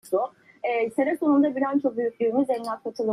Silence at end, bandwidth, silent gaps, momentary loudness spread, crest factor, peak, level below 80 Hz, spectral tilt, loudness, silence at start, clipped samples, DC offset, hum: 0 s; 12.5 kHz; none; 9 LU; 14 dB; -10 dBFS; -74 dBFS; -6.5 dB/octave; -25 LUFS; 0.05 s; under 0.1%; under 0.1%; none